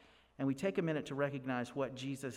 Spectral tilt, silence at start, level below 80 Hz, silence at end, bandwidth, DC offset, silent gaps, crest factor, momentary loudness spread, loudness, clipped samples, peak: -6.5 dB/octave; 0.4 s; -72 dBFS; 0 s; 13.5 kHz; under 0.1%; none; 16 dB; 5 LU; -38 LUFS; under 0.1%; -22 dBFS